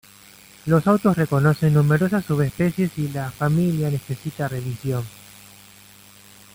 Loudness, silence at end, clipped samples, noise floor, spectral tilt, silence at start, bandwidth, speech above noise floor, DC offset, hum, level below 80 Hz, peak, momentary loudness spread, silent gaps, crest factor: -21 LUFS; 1.45 s; under 0.1%; -48 dBFS; -7.5 dB/octave; 0.65 s; 16.5 kHz; 28 dB; under 0.1%; none; -52 dBFS; -4 dBFS; 10 LU; none; 18 dB